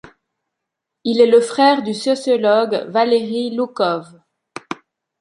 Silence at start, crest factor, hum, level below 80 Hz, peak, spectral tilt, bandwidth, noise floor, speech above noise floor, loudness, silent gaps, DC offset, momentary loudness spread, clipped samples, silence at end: 1.05 s; 16 dB; none; -66 dBFS; -2 dBFS; -4.5 dB/octave; 11 kHz; -80 dBFS; 64 dB; -16 LUFS; none; under 0.1%; 19 LU; under 0.1%; 0.45 s